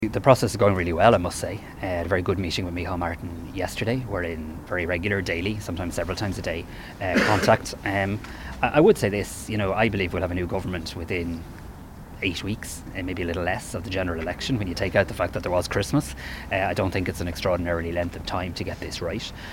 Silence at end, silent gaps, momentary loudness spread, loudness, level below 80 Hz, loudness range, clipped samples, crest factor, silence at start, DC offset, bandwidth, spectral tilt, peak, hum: 0 s; none; 13 LU; -25 LUFS; -42 dBFS; 6 LU; under 0.1%; 24 dB; 0 s; under 0.1%; 17 kHz; -5.5 dB/octave; 0 dBFS; none